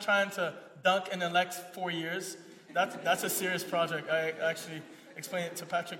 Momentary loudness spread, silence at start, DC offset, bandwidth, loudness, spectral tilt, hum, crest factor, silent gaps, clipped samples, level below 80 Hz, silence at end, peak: 12 LU; 0 s; under 0.1%; 16.5 kHz; -32 LUFS; -3 dB/octave; none; 20 dB; none; under 0.1%; -88 dBFS; 0 s; -14 dBFS